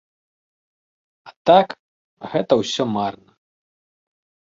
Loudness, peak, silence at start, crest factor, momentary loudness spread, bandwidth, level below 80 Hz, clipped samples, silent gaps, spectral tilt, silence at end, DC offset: -19 LUFS; -2 dBFS; 1.25 s; 22 dB; 15 LU; 7.8 kHz; -64 dBFS; under 0.1%; 1.36-1.45 s, 1.79-2.17 s; -5 dB/octave; 1.35 s; under 0.1%